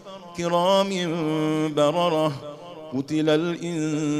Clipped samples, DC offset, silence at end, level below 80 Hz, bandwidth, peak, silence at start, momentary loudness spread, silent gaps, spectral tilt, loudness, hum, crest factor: under 0.1%; under 0.1%; 0 s; -66 dBFS; 13 kHz; -8 dBFS; 0 s; 13 LU; none; -5.5 dB/octave; -23 LUFS; none; 16 dB